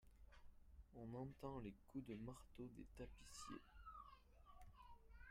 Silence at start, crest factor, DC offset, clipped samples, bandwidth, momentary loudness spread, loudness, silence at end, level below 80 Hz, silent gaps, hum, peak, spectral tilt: 0 s; 18 dB; under 0.1%; under 0.1%; 15.5 kHz; 13 LU; -58 LUFS; 0 s; -68 dBFS; none; none; -40 dBFS; -6 dB/octave